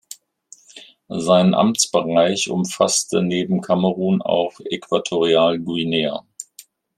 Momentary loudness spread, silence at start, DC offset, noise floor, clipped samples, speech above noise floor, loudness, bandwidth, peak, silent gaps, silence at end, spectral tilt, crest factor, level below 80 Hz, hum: 15 LU; 0.1 s; under 0.1%; -49 dBFS; under 0.1%; 31 dB; -19 LUFS; 15 kHz; -2 dBFS; none; 0.55 s; -4.5 dB/octave; 18 dB; -64 dBFS; none